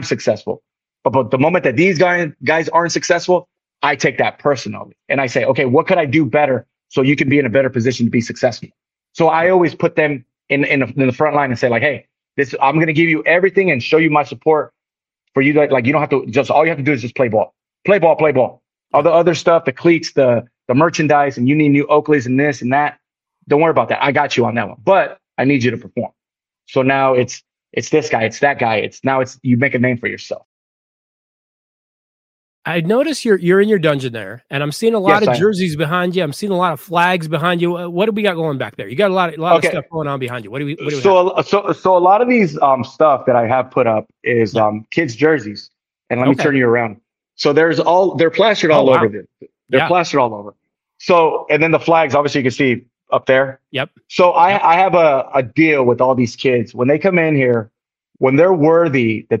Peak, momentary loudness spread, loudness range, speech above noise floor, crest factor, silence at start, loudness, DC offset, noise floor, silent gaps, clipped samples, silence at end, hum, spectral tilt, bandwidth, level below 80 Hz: 0 dBFS; 9 LU; 4 LU; 73 dB; 16 dB; 0 s; -15 LUFS; under 0.1%; -88 dBFS; 30.45-32.62 s; under 0.1%; 0 s; none; -6 dB/octave; 15.5 kHz; -58 dBFS